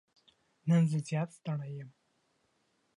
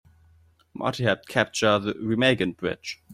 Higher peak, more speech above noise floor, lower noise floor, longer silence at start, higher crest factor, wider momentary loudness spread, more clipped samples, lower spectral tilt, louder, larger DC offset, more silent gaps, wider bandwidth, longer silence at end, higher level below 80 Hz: second, -18 dBFS vs -4 dBFS; first, 44 dB vs 34 dB; first, -75 dBFS vs -59 dBFS; about the same, 0.65 s vs 0.75 s; about the same, 18 dB vs 22 dB; first, 17 LU vs 9 LU; neither; first, -8 dB/octave vs -5 dB/octave; second, -32 LUFS vs -24 LUFS; neither; neither; second, 11 kHz vs 15.5 kHz; first, 1.1 s vs 0 s; second, -82 dBFS vs -60 dBFS